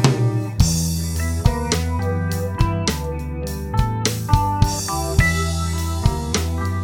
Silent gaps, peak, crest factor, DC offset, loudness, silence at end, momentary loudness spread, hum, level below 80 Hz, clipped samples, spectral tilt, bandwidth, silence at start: none; 0 dBFS; 18 dB; under 0.1%; -21 LUFS; 0 s; 6 LU; none; -26 dBFS; under 0.1%; -5 dB/octave; 19 kHz; 0 s